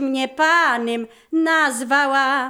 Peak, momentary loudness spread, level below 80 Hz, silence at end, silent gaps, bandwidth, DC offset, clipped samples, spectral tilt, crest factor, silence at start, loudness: -4 dBFS; 9 LU; -70 dBFS; 0 s; none; 19 kHz; under 0.1%; under 0.1%; -1.5 dB/octave; 14 dB; 0 s; -18 LUFS